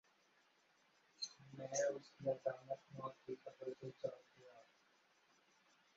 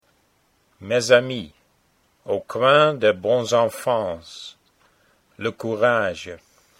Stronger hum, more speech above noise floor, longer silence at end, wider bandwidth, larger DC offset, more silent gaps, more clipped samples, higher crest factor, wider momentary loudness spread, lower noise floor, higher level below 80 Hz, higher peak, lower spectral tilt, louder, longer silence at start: neither; second, 30 dB vs 43 dB; first, 1.35 s vs 0.45 s; second, 7.6 kHz vs 16 kHz; neither; neither; neither; about the same, 22 dB vs 22 dB; about the same, 21 LU vs 21 LU; first, -76 dBFS vs -64 dBFS; second, -90 dBFS vs -62 dBFS; second, -28 dBFS vs 0 dBFS; about the same, -3.5 dB/octave vs -4 dB/octave; second, -47 LUFS vs -20 LUFS; first, 1.2 s vs 0.8 s